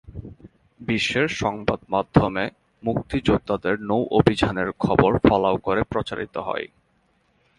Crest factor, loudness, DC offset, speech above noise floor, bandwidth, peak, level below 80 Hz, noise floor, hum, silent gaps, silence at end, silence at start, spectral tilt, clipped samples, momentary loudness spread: 22 dB; -22 LUFS; under 0.1%; 43 dB; 11.5 kHz; 0 dBFS; -42 dBFS; -65 dBFS; none; none; 0.95 s; 0.1 s; -6.5 dB/octave; under 0.1%; 12 LU